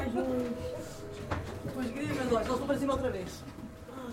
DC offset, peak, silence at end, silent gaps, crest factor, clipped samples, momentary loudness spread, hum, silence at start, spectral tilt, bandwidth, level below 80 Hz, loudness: under 0.1%; -18 dBFS; 0 s; none; 16 dB; under 0.1%; 13 LU; none; 0 s; -6 dB/octave; 16 kHz; -52 dBFS; -34 LUFS